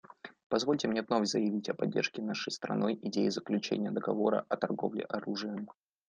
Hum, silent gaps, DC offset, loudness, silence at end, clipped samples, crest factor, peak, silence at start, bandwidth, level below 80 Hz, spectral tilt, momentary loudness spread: none; 0.43-0.50 s; under 0.1%; -33 LUFS; 0.4 s; under 0.1%; 18 dB; -14 dBFS; 0.25 s; 9.6 kHz; -76 dBFS; -5 dB/octave; 7 LU